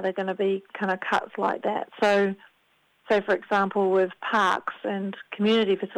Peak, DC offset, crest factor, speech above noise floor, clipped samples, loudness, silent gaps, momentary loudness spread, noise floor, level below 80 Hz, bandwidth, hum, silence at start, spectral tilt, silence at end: -10 dBFS; under 0.1%; 16 dB; 41 dB; under 0.1%; -25 LUFS; none; 8 LU; -66 dBFS; -70 dBFS; 10.5 kHz; none; 0 s; -5.5 dB/octave; 0 s